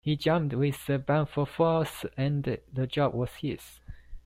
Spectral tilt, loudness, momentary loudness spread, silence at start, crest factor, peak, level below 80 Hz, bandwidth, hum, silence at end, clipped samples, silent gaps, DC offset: -7 dB/octave; -29 LUFS; 9 LU; 0.05 s; 16 dB; -12 dBFS; -52 dBFS; 16 kHz; none; 0.05 s; under 0.1%; none; under 0.1%